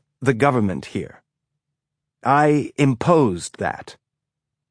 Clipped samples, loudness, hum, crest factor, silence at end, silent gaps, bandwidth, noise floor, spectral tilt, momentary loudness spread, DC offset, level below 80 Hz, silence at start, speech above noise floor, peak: under 0.1%; -20 LUFS; none; 20 dB; 0.8 s; none; 10.5 kHz; -83 dBFS; -6.5 dB/octave; 14 LU; under 0.1%; -56 dBFS; 0.2 s; 64 dB; -2 dBFS